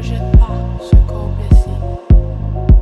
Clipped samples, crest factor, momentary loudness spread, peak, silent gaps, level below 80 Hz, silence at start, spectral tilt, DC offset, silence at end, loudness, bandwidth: under 0.1%; 10 dB; 8 LU; 0 dBFS; none; -12 dBFS; 0 s; -9 dB/octave; under 0.1%; 0 s; -15 LUFS; 5.6 kHz